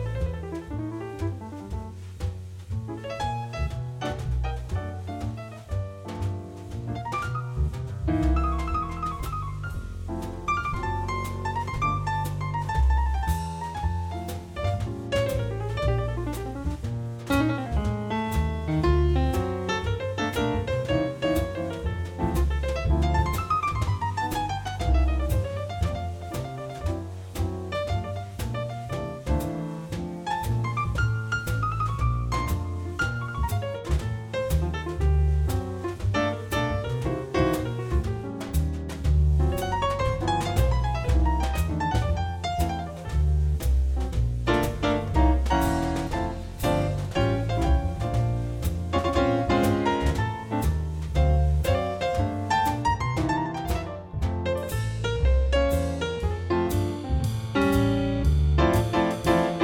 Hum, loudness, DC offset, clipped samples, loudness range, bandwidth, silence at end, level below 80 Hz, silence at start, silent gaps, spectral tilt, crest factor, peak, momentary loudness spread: none; -27 LUFS; under 0.1%; under 0.1%; 6 LU; 17.5 kHz; 0 s; -30 dBFS; 0 s; none; -6.5 dB/octave; 18 dB; -6 dBFS; 10 LU